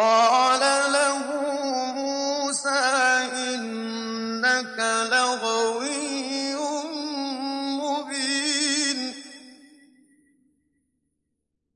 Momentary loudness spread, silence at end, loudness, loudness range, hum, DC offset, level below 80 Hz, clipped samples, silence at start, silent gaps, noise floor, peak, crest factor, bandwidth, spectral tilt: 10 LU; 2.2 s; -23 LUFS; 5 LU; none; under 0.1%; -80 dBFS; under 0.1%; 0 s; none; -79 dBFS; -10 dBFS; 16 dB; 11.5 kHz; -0.5 dB/octave